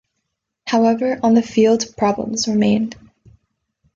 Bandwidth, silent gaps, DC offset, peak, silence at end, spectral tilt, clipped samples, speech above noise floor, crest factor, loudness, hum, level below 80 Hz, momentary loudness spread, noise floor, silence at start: 7.6 kHz; none; under 0.1%; -4 dBFS; 1 s; -5 dB/octave; under 0.1%; 60 dB; 14 dB; -17 LUFS; none; -54 dBFS; 5 LU; -76 dBFS; 0.65 s